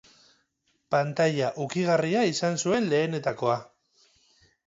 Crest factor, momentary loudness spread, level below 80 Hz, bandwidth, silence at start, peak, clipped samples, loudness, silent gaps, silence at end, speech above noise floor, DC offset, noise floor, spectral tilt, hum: 16 dB; 5 LU; -68 dBFS; 8 kHz; 0.9 s; -10 dBFS; under 0.1%; -26 LUFS; none; 1.05 s; 48 dB; under 0.1%; -73 dBFS; -5 dB/octave; none